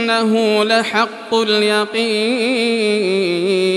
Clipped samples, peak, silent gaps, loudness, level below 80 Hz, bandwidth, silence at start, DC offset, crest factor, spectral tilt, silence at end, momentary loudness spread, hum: under 0.1%; -2 dBFS; none; -16 LUFS; -72 dBFS; 12.5 kHz; 0 s; under 0.1%; 14 dB; -4 dB/octave; 0 s; 3 LU; none